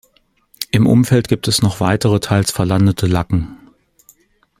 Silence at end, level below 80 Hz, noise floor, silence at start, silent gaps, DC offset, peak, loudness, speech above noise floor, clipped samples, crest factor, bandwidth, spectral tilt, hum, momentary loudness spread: 1.05 s; -40 dBFS; -58 dBFS; 0.6 s; none; under 0.1%; 0 dBFS; -15 LUFS; 44 dB; under 0.1%; 16 dB; 16.5 kHz; -5.5 dB/octave; none; 8 LU